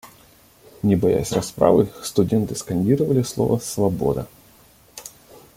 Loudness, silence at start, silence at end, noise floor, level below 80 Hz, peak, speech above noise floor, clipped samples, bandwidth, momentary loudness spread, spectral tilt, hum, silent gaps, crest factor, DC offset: -21 LUFS; 0.05 s; 0.45 s; -52 dBFS; -48 dBFS; -2 dBFS; 32 dB; under 0.1%; 16.5 kHz; 21 LU; -6.5 dB/octave; none; none; 20 dB; under 0.1%